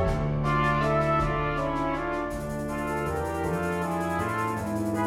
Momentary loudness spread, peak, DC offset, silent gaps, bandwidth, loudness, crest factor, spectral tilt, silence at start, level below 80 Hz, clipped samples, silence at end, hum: 7 LU; -14 dBFS; under 0.1%; none; 16 kHz; -27 LUFS; 14 dB; -6.5 dB/octave; 0 s; -38 dBFS; under 0.1%; 0 s; none